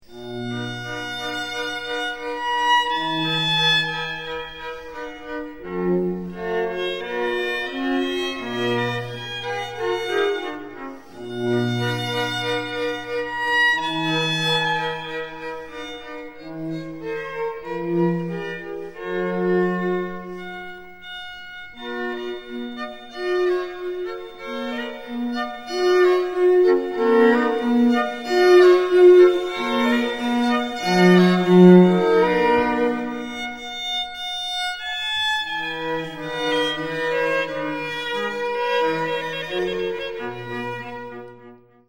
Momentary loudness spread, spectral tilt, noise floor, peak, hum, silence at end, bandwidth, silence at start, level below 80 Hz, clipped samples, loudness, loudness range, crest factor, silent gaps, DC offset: 17 LU; -5.5 dB/octave; -47 dBFS; -2 dBFS; none; 0.3 s; 16 kHz; 0.1 s; -56 dBFS; under 0.1%; -21 LUFS; 12 LU; 20 dB; none; 0.5%